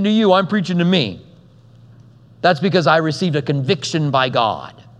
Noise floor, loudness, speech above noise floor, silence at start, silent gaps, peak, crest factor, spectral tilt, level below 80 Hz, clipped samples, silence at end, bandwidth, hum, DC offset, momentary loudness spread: -46 dBFS; -17 LUFS; 29 dB; 0 s; none; 0 dBFS; 18 dB; -6 dB/octave; -60 dBFS; under 0.1%; 0.2 s; 10 kHz; none; under 0.1%; 6 LU